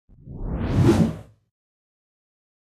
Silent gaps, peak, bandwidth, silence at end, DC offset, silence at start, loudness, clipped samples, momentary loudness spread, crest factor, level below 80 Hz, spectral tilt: none; -6 dBFS; 14 kHz; 1.45 s; under 0.1%; 0.25 s; -22 LUFS; under 0.1%; 21 LU; 20 dB; -36 dBFS; -8 dB/octave